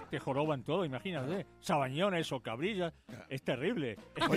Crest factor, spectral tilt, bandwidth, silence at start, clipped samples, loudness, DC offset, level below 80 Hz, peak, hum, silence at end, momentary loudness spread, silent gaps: 20 dB; -6 dB/octave; 15 kHz; 0 s; under 0.1%; -36 LUFS; under 0.1%; -66 dBFS; -16 dBFS; none; 0 s; 7 LU; none